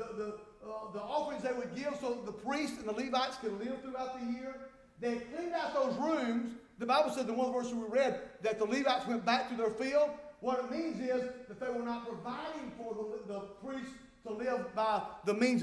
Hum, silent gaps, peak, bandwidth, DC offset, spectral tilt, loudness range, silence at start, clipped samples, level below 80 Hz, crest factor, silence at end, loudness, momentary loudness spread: none; none; -18 dBFS; 11 kHz; under 0.1%; -4.5 dB/octave; 6 LU; 0 s; under 0.1%; -70 dBFS; 18 dB; 0 s; -36 LUFS; 11 LU